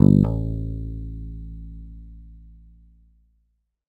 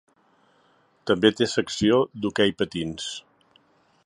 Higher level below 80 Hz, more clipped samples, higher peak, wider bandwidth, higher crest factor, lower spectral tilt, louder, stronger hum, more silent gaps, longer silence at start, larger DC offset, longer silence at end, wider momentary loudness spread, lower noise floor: first, -36 dBFS vs -56 dBFS; neither; first, 0 dBFS vs -4 dBFS; second, 4.3 kHz vs 11 kHz; about the same, 24 dB vs 22 dB; first, -12 dB/octave vs -4.5 dB/octave; about the same, -24 LUFS vs -23 LUFS; neither; neither; second, 0 s vs 1.05 s; neither; first, 1.45 s vs 0.85 s; first, 26 LU vs 13 LU; first, -70 dBFS vs -62 dBFS